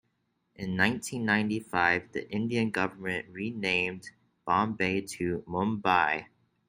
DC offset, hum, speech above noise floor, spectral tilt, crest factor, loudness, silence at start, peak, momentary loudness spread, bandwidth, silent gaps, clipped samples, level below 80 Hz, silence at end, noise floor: under 0.1%; none; 47 dB; -5 dB/octave; 22 dB; -29 LUFS; 0.6 s; -8 dBFS; 9 LU; 16 kHz; none; under 0.1%; -66 dBFS; 0.45 s; -76 dBFS